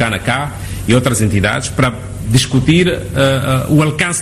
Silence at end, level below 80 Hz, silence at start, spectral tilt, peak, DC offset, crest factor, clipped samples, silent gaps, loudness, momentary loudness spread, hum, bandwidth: 0 s; -32 dBFS; 0 s; -5 dB/octave; 0 dBFS; under 0.1%; 14 dB; under 0.1%; none; -14 LUFS; 6 LU; none; 14 kHz